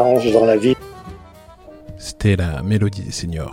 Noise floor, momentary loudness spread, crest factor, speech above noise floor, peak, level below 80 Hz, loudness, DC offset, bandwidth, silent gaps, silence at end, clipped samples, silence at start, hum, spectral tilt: -42 dBFS; 23 LU; 18 dB; 25 dB; 0 dBFS; -38 dBFS; -18 LUFS; under 0.1%; 16 kHz; none; 0 s; under 0.1%; 0 s; none; -6.5 dB/octave